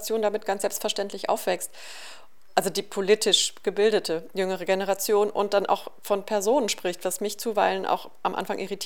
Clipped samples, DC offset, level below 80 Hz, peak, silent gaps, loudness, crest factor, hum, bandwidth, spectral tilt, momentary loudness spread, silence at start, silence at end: under 0.1%; 0.8%; -74 dBFS; -4 dBFS; none; -25 LUFS; 22 dB; none; 19.5 kHz; -2.5 dB/octave; 8 LU; 0 s; 0 s